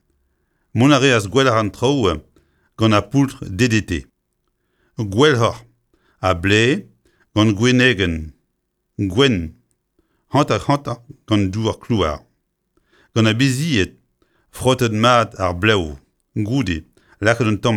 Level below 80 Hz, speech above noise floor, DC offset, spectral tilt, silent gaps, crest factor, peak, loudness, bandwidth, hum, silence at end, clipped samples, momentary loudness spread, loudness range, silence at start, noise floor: -42 dBFS; 55 dB; under 0.1%; -5.5 dB/octave; none; 18 dB; 0 dBFS; -18 LUFS; 14 kHz; none; 0 s; under 0.1%; 13 LU; 4 LU; 0.75 s; -72 dBFS